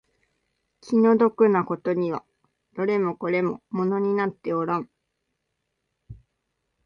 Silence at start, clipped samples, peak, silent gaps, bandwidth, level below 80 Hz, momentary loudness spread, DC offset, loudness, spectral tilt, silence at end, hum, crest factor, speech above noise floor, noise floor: 0.85 s; under 0.1%; -6 dBFS; none; 6.8 kHz; -64 dBFS; 10 LU; under 0.1%; -23 LUFS; -8.5 dB/octave; 0.7 s; none; 18 dB; 56 dB; -78 dBFS